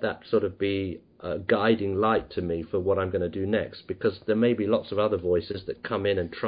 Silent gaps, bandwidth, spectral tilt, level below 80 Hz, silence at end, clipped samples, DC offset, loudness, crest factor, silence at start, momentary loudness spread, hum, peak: none; 5.2 kHz; -10.5 dB/octave; -48 dBFS; 0 s; under 0.1%; under 0.1%; -27 LUFS; 16 dB; 0 s; 8 LU; none; -10 dBFS